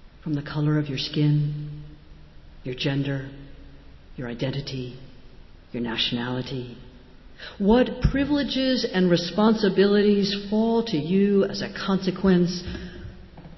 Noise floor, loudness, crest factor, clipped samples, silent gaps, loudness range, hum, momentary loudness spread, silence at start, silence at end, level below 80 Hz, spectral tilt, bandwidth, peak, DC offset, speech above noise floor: -46 dBFS; -23 LUFS; 18 dB; under 0.1%; none; 10 LU; none; 18 LU; 0.05 s; 0 s; -42 dBFS; -7 dB/octave; 6.2 kHz; -8 dBFS; under 0.1%; 23 dB